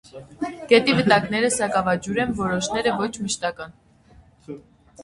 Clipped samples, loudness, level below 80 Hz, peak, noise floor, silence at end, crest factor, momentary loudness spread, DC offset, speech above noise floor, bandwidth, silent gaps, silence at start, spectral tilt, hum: under 0.1%; -21 LUFS; -52 dBFS; -2 dBFS; -52 dBFS; 0 s; 22 dB; 22 LU; under 0.1%; 31 dB; 11.5 kHz; none; 0.15 s; -4 dB/octave; none